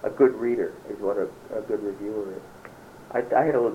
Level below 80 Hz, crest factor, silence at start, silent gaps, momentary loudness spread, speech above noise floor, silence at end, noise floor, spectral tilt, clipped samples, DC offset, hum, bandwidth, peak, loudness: -62 dBFS; 20 dB; 0 s; none; 22 LU; 20 dB; 0 s; -45 dBFS; -7.5 dB/octave; under 0.1%; under 0.1%; none; 15.5 kHz; -6 dBFS; -26 LUFS